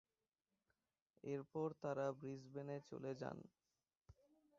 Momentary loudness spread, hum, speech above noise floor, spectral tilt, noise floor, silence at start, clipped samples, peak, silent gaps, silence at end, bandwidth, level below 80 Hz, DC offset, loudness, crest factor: 10 LU; none; over 42 dB; -7 dB/octave; under -90 dBFS; 1.25 s; under 0.1%; -30 dBFS; 3.97-4.01 s; 0.45 s; 7.4 kHz; -84 dBFS; under 0.1%; -49 LUFS; 20 dB